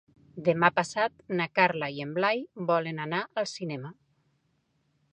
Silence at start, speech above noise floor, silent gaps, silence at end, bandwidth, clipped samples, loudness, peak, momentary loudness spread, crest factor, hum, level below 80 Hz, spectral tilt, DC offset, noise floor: 0.35 s; 45 dB; none; 1.2 s; 10.5 kHz; under 0.1%; -28 LUFS; -6 dBFS; 12 LU; 24 dB; none; -72 dBFS; -5 dB/octave; under 0.1%; -73 dBFS